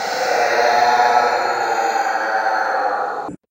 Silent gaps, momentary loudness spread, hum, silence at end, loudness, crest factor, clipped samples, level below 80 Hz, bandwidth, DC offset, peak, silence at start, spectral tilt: none; 6 LU; none; 0.15 s; -17 LUFS; 16 dB; under 0.1%; -66 dBFS; 16 kHz; under 0.1%; -2 dBFS; 0 s; -1.5 dB/octave